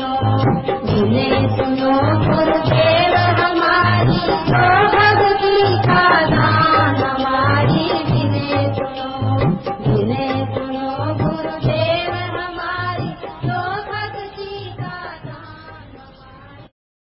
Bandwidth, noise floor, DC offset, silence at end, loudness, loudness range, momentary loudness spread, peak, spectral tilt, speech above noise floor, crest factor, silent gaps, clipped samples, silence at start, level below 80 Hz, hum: 5.8 kHz; -41 dBFS; under 0.1%; 0.4 s; -16 LUFS; 12 LU; 14 LU; -2 dBFS; -11 dB/octave; 26 dB; 14 dB; none; under 0.1%; 0 s; -38 dBFS; none